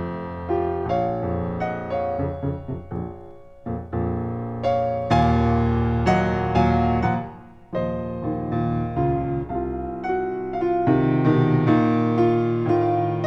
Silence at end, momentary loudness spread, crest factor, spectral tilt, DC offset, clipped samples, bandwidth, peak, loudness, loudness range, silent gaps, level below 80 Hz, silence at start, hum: 0 s; 12 LU; 16 dB; -9 dB/octave; under 0.1%; under 0.1%; 7.6 kHz; -6 dBFS; -23 LUFS; 7 LU; none; -38 dBFS; 0 s; none